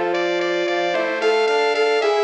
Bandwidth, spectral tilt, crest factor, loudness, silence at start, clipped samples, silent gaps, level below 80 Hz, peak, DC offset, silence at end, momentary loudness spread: 8.8 kHz; -3 dB/octave; 12 dB; -19 LUFS; 0 s; under 0.1%; none; -74 dBFS; -6 dBFS; under 0.1%; 0 s; 3 LU